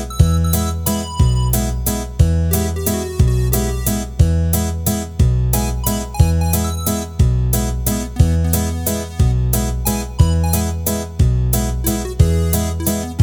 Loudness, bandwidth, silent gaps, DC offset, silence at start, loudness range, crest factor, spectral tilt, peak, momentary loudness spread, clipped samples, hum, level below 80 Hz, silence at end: -17 LUFS; over 20 kHz; none; under 0.1%; 0 s; 0 LU; 16 dB; -5.5 dB/octave; 0 dBFS; 5 LU; under 0.1%; none; -20 dBFS; 0 s